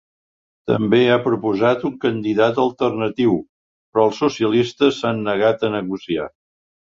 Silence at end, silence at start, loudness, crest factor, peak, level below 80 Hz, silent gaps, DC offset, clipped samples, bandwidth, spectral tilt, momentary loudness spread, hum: 0.65 s; 0.65 s; -19 LUFS; 16 dB; -2 dBFS; -56 dBFS; 3.49-3.93 s; under 0.1%; under 0.1%; 7.6 kHz; -6.5 dB/octave; 8 LU; none